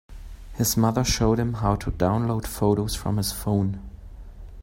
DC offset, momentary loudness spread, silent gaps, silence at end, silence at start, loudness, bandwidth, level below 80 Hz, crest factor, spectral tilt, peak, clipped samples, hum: under 0.1%; 20 LU; none; 0 s; 0.1 s; -24 LUFS; 16.5 kHz; -38 dBFS; 20 dB; -5.5 dB/octave; -6 dBFS; under 0.1%; none